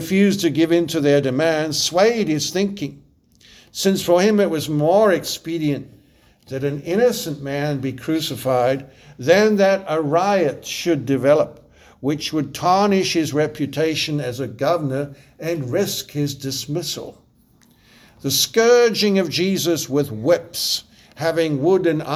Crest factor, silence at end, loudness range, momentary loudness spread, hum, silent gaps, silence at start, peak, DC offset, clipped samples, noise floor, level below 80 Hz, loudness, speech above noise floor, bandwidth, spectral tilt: 18 dB; 0 s; 5 LU; 10 LU; none; none; 0 s; -2 dBFS; under 0.1%; under 0.1%; -55 dBFS; -56 dBFS; -19 LUFS; 36 dB; over 20 kHz; -4.5 dB/octave